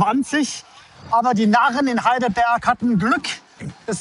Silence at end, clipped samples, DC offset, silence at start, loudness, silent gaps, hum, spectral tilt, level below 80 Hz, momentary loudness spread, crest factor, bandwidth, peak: 0 s; under 0.1%; under 0.1%; 0 s; -19 LUFS; none; none; -4.5 dB/octave; -54 dBFS; 14 LU; 16 dB; 11.5 kHz; -4 dBFS